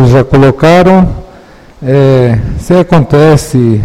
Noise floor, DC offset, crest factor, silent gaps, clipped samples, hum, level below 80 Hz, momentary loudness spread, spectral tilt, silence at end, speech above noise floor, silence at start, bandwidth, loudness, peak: -34 dBFS; under 0.1%; 6 dB; none; 3%; none; -24 dBFS; 8 LU; -7.5 dB/octave; 0 s; 29 dB; 0 s; 14 kHz; -6 LUFS; 0 dBFS